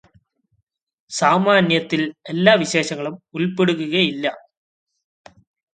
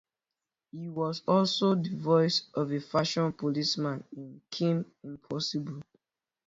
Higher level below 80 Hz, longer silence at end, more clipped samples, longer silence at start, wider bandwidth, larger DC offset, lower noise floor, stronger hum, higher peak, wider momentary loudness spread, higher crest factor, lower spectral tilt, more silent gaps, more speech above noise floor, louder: first, -64 dBFS vs -72 dBFS; first, 1.35 s vs 0.65 s; neither; first, 1.1 s vs 0.75 s; first, 9.4 kHz vs 7.8 kHz; neither; second, -69 dBFS vs -90 dBFS; neither; first, 0 dBFS vs -12 dBFS; second, 11 LU vs 17 LU; about the same, 20 dB vs 18 dB; second, -4.5 dB/octave vs -6 dB/octave; neither; second, 51 dB vs 60 dB; first, -19 LUFS vs -29 LUFS